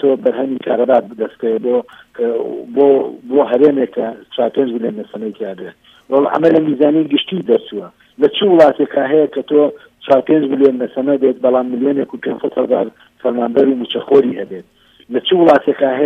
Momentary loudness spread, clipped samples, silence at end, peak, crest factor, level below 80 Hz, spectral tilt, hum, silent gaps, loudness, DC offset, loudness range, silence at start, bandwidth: 13 LU; under 0.1%; 0 s; 0 dBFS; 14 dB; -62 dBFS; -7.5 dB/octave; none; none; -14 LUFS; under 0.1%; 3 LU; 0 s; 5.4 kHz